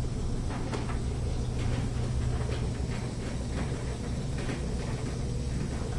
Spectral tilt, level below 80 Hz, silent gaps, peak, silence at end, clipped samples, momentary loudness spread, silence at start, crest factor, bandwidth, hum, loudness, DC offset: -6 dB/octave; -36 dBFS; none; -18 dBFS; 0 s; under 0.1%; 3 LU; 0 s; 14 dB; 11.5 kHz; none; -33 LUFS; under 0.1%